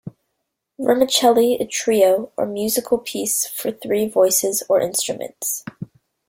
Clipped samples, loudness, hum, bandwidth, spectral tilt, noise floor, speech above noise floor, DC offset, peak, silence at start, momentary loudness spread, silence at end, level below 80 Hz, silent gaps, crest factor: under 0.1%; -19 LUFS; none; 16.5 kHz; -2.5 dB/octave; -76 dBFS; 57 dB; under 0.1%; -2 dBFS; 0.05 s; 10 LU; 0.45 s; -62 dBFS; none; 18 dB